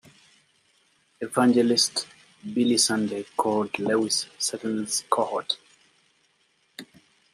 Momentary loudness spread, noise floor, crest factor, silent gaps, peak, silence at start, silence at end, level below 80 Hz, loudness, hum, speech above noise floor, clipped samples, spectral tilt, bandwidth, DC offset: 21 LU; -67 dBFS; 22 dB; none; -6 dBFS; 1.2 s; 0.5 s; -74 dBFS; -24 LUFS; none; 43 dB; under 0.1%; -3 dB/octave; 15 kHz; under 0.1%